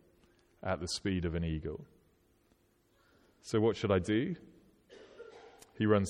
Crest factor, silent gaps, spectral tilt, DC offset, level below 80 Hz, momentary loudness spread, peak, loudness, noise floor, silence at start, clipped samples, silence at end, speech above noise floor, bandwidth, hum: 20 dB; none; -6 dB/octave; under 0.1%; -54 dBFS; 23 LU; -16 dBFS; -34 LUFS; -71 dBFS; 0.65 s; under 0.1%; 0 s; 38 dB; 13 kHz; none